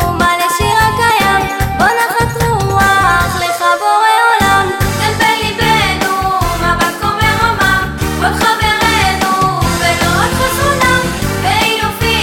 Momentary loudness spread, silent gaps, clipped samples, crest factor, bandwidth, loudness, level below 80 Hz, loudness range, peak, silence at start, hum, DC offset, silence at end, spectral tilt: 4 LU; none; under 0.1%; 12 dB; 17 kHz; -11 LUFS; -26 dBFS; 1 LU; 0 dBFS; 0 s; none; under 0.1%; 0 s; -3.5 dB/octave